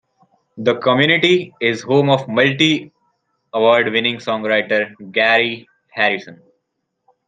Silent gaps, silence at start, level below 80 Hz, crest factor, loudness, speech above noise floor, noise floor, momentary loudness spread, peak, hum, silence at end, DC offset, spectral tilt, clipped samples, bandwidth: none; 0.55 s; -64 dBFS; 18 dB; -16 LUFS; 58 dB; -74 dBFS; 8 LU; 0 dBFS; none; 0.95 s; under 0.1%; -5 dB/octave; under 0.1%; 9.4 kHz